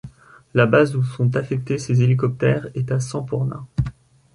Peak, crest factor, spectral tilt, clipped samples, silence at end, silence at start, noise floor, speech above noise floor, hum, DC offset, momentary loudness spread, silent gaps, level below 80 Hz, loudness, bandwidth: -2 dBFS; 20 dB; -7.5 dB/octave; under 0.1%; 0.45 s; 0.05 s; -42 dBFS; 23 dB; none; under 0.1%; 9 LU; none; -44 dBFS; -21 LUFS; 11 kHz